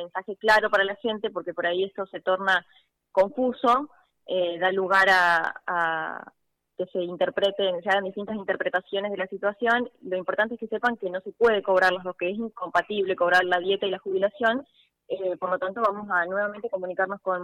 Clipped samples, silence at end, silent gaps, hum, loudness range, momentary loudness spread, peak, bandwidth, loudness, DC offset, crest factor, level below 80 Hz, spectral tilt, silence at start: under 0.1%; 0 s; none; none; 4 LU; 10 LU; -10 dBFS; 15.5 kHz; -25 LUFS; under 0.1%; 14 dB; -66 dBFS; -4.5 dB/octave; 0 s